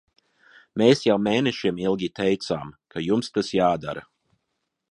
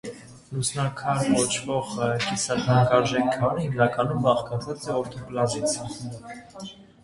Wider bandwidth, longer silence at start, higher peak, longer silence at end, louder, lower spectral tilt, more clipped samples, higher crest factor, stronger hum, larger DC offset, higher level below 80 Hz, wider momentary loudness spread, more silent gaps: about the same, 11.5 kHz vs 11.5 kHz; first, 0.75 s vs 0.05 s; about the same, -4 dBFS vs -4 dBFS; first, 0.9 s vs 0.2 s; about the same, -23 LUFS vs -24 LUFS; about the same, -5.5 dB/octave vs -5 dB/octave; neither; about the same, 20 dB vs 20 dB; neither; neither; about the same, -58 dBFS vs -54 dBFS; second, 14 LU vs 18 LU; neither